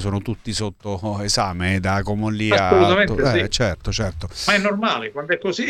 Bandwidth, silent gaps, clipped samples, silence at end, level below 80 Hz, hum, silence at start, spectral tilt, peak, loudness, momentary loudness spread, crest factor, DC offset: 13.5 kHz; none; under 0.1%; 0 s; -38 dBFS; none; 0 s; -4.5 dB/octave; -2 dBFS; -20 LUFS; 11 LU; 18 dB; under 0.1%